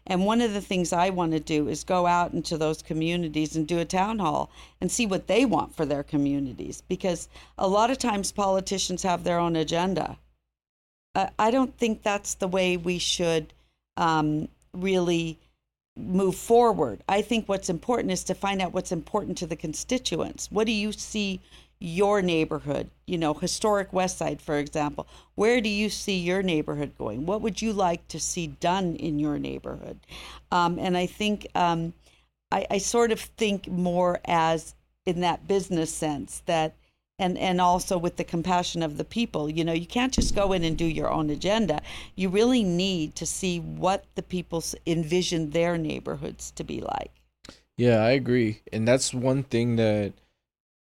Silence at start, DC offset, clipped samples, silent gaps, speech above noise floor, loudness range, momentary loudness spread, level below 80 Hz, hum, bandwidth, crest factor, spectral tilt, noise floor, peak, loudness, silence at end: 0.05 s; under 0.1%; under 0.1%; 10.69-11.14 s, 15.88-15.96 s; 36 dB; 3 LU; 9 LU; -46 dBFS; none; 16.5 kHz; 18 dB; -4.5 dB/octave; -62 dBFS; -8 dBFS; -26 LUFS; 0.8 s